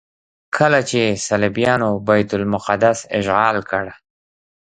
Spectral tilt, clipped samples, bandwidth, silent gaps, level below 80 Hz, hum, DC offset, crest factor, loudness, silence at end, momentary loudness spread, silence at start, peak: -5 dB/octave; under 0.1%; 10 kHz; none; -50 dBFS; none; under 0.1%; 18 dB; -17 LUFS; 0.75 s; 7 LU; 0.55 s; 0 dBFS